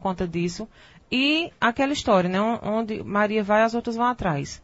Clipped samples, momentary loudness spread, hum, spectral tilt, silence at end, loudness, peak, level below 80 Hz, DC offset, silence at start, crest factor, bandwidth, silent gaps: under 0.1%; 7 LU; none; -5 dB/octave; 0.05 s; -23 LUFS; -8 dBFS; -50 dBFS; under 0.1%; 0 s; 16 dB; 8 kHz; none